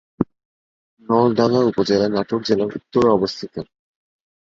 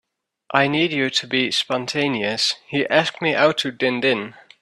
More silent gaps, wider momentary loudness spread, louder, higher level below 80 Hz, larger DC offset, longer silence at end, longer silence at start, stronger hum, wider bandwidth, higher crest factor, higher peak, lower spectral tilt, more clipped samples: first, 0.45-0.97 s vs none; first, 13 LU vs 5 LU; about the same, -19 LUFS vs -20 LUFS; first, -54 dBFS vs -64 dBFS; neither; first, 0.85 s vs 0.3 s; second, 0.2 s vs 0.5 s; neither; second, 7.6 kHz vs 13 kHz; about the same, 18 dB vs 20 dB; about the same, -2 dBFS vs -2 dBFS; first, -6.5 dB/octave vs -4 dB/octave; neither